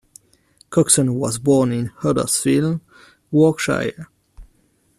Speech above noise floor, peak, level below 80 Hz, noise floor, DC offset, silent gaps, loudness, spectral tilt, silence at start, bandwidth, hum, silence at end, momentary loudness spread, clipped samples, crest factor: 42 dB; 0 dBFS; -50 dBFS; -60 dBFS; under 0.1%; none; -18 LUFS; -5 dB/octave; 0.7 s; 14 kHz; none; 0.55 s; 9 LU; under 0.1%; 20 dB